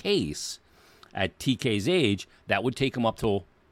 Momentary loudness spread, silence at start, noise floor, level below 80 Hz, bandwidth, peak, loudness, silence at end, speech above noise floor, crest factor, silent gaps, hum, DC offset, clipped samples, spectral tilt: 10 LU; 0.05 s; -56 dBFS; -54 dBFS; 16 kHz; -8 dBFS; -28 LUFS; 0.3 s; 29 dB; 20 dB; none; none; under 0.1%; under 0.1%; -5 dB/octave